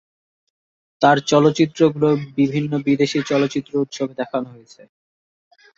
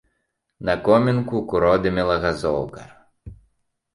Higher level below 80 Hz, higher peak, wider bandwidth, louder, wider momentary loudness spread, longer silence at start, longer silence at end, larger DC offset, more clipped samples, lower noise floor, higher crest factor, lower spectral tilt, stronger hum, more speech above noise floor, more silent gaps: second, -62 dBFS vs -44 dBFS; about the same, -2 dBFS vs -2 dBFS; second, 7.8 kHz vs 11.5 kHz; about the same, -19 LUFS vs -20 LUFS; about the same, 10 LU vs 9 LU; first, 1 s vs 0.6 s; first, 1.3 s vs 0.6 s; neither; neither; first, under -90 dBFS vs -74 dBFS; about the same, 18 dB vs 20 dB; second, -6 dB/octave vs -7.5 dB/octave; neither; first, over 72 dB vs 54 dB; neither